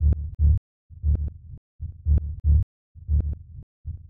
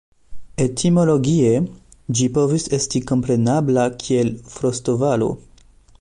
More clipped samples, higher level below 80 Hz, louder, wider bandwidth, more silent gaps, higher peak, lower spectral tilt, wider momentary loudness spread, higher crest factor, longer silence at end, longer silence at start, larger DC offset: neither; first, -26 dBFS vs -48 dBFS; second, -26 LUFS vs -19 LUFS; second, 0.8 kHz vs 11 kHz; first, 0.58-0.89 s, 1.58-1.79 s, 2.63-2.95 s, 3.63-3.84 s vs none; second, -10 dBFS vs -6 dBFS; first, -14.5 dB/octave vs -6 dB/octave; first, 20 LU vs 8 LU; about the same, 14 dB vs 14 dB; second, 0.05 s vs 0.6 s; second, 0 s vs 0.3 s; neither